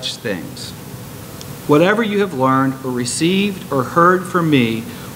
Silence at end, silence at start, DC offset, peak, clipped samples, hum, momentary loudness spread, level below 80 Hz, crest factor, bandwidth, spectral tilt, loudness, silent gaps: 0 s; 0 s; under 0.1%; 0 dBFS; under 0.1%; none; 18 LU; -50 dBFS; 18 dB; 16 kHz; -5 dB/octave; -16 LUFS; none